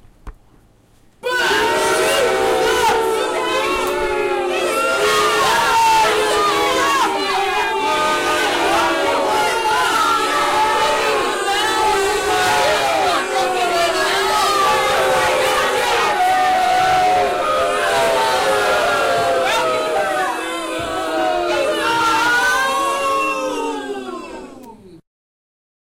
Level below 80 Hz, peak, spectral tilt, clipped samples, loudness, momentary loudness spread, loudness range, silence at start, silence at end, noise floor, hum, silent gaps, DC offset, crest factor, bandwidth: -46 dBFS; -6 dBFS; -2 dB/octave; under 0.1%; -16 LUFS; 5 LU; 3 LU; 0.25 s; 0.95 s; -51 dBFS; none; none; under 0.1%; 10 dB; 16 kHz